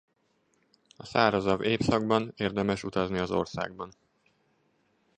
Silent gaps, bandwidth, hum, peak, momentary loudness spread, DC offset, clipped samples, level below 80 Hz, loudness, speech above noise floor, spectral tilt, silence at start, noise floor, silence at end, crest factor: none; 9.8 kHz; none; -6 dBFS; 12 LU; under 0.1%; under 0.1%; -56 dBFS; -28 LUFS; 44 dB; -6 dB/octave; 1 s; -72 dBFS; 1.3 s; 24 dB